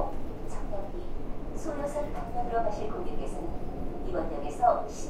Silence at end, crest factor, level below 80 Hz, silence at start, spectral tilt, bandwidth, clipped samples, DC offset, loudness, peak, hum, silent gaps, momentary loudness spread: 0 s; 20 dB; -36 dBFS; 0 s; -6.5 dB/octave; 10 kHz; under 0.1%; under 0.1%; -34 LUFS; -10 dBFS; none; none; 14 LU